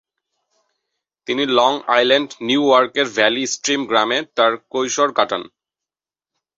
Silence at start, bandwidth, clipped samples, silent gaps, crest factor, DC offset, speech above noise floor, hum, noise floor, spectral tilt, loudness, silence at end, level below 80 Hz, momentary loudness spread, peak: 1.3 s; 8 kHz; under 0.1%; none; 18 dB; under 0.1%; over 73 dB; none; under -90 dBFS; -2 dB/octave; -17 LUFS; 1.1 s; -64 dBFS; 7 LU; 0 dBFS